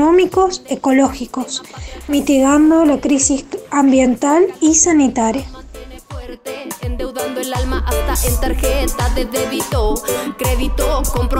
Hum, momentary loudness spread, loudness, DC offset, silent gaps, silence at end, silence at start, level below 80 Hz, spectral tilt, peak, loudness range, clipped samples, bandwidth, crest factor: none; 17 LU; -15 LUFS; under 0.1%; none; 0 s; 0 s; -24 dBFS; -4.5 dB/octave; -2 dBFS; 8 LU; under 0.1%; 16.5 kHz; 14 dB